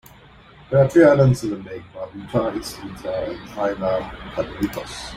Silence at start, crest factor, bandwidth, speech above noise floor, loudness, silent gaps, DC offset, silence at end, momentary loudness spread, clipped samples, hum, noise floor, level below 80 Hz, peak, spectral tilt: 0.7 s; 20 dB; 16 kHz; 27 dB; -20 LUFS; none; under 0.1%; 0 s; 19 LU; under 0.1%; none; -47 dBFS; -46 dBFS; -2 dBFS; -7 dB/octave